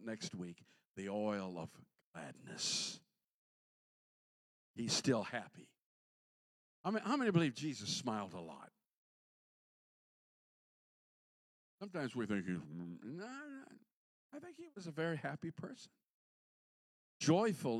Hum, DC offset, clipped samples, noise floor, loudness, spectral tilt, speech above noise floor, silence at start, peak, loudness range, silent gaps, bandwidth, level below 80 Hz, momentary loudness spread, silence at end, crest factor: none; under 0.1%; under 0.1%; under -90 dBFS; -40 LUFS; -4.5 dB/octave; over 49 dB; 0 s; -20 dBFS; 8 LU; 0.85-0.94 s, 2.03-2.14 s, 3.24-4.74 s, 5.79-6.84 s, 8.86-11.78 s, 13.91-14.30 s, 16.03-17.20 s; 13.5 kHz; -86 dBFS; 20 LU; 0 s; 24 dB